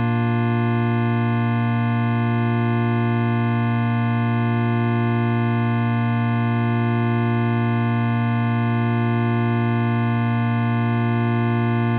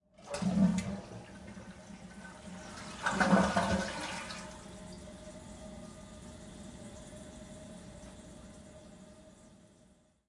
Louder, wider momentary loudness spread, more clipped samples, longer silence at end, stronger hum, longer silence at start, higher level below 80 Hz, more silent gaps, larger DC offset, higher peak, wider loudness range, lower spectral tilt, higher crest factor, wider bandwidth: first, -20 LUFS vs -33 LUFS; second, 0 LU vs 22 LU; neither; second, 0 s vs 0.55 s; neither; second, 0 s vs 0.2 s; second, -62 dBFS vs -56 dBFS; neither; neither; first, -10 dBFS vs -14 dBFS; second, 0 LU vs 17 LU; first, -7.5 dB/octave vs -5.5 dB/octave; second, 10 dB vs 24 dB; second, 4.2 kHz vs 11.5 kHz